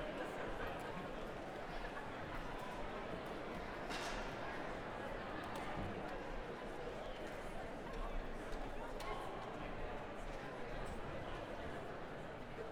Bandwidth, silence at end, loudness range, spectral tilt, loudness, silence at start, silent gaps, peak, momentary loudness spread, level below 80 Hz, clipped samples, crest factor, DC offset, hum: 16.5 kHz; 0 s; 2 LU; -5 dB/octave; -47 LUFS; 0 s; none; -32 dBFS; 3 LU; -52 dBFS; under 0.1%; 14 dB; under 0.1%; none